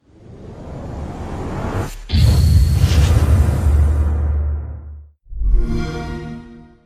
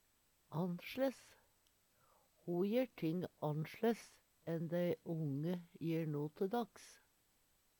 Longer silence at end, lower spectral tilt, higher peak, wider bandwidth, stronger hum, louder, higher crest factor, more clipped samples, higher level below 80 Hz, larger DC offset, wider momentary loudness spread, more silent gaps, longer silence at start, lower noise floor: second, 0.2 s vs 0.85 s; about the same, -6.5 dB/octave vs -7.5 dB/octave; first, -2 dBFS vs -24 dBFS; second, 14.5 kHz vs 19 kHz; neither; first, -18 LUFS vs -42 LUFS; about the same, 14 dB vs 18 dB; neither; first, -20 dBFS vs -82 dBFS; neither; first, 20 LU vs 13 LU; neither; second, 0.3 s vs 0.5 s; second, -38 dBFS vs -76 dBFS